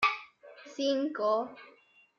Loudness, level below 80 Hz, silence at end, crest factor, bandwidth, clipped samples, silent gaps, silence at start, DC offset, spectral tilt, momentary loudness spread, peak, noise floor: -32 LUFS; -76 dBFS; 0.5 s; 20 dB; 11 kHz; under 0.1%; none; 0 s; under 0.1%; -3 dB/octave; 22 LU; -14 dBFS; -52 dBFS